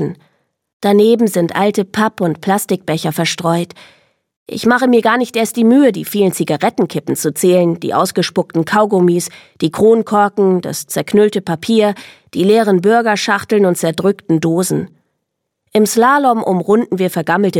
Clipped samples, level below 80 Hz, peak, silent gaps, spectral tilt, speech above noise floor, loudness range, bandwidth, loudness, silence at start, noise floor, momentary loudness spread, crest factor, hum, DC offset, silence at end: under 0.1%; -60 dBFS; 0 dBFS; 0.73-0.80 s, 4.36-4.46 s; -5 dB/octave; 60 dB; 2 LU; 17.5 kHz; -14 LUFS; 0 s; -74 dBFS; 8 LU; 14 dB; none; under 0.1%; 0 s